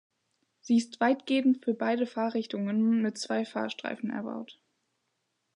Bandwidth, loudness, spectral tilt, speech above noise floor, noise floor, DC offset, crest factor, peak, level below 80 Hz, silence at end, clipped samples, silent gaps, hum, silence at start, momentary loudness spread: 10.5 kHz; -29 LUFS; -5.5 dB/octave; 51 dB; -79 dBFS; under 0.1%; 16 dB; -14 dBFS; -84 dBFS; 1.05 s; under 0.1%; none; none; 0.65 s; 9 LU